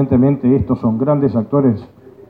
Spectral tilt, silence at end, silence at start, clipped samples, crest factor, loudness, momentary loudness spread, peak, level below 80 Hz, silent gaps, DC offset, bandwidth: -12.5 dB/octave; 0.45 s; 0 s; under 0.1%; 12 dB; -15 LUFS; 4 LU; -2 dBFS; -42 dBFS; none; under 0.1%; 4.6 kHz